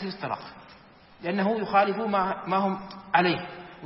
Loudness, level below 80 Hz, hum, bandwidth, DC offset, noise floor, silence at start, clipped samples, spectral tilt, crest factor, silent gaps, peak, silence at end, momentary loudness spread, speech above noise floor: -26 LUFS; -64 dBFS; none; 5.8 kHz; under 0.1%; -52 dBFS; 0 s; under 0.1%; -10 dB/octave; 20 dB; none; -8 dBFS; 0 s; 13 LU; 26 dB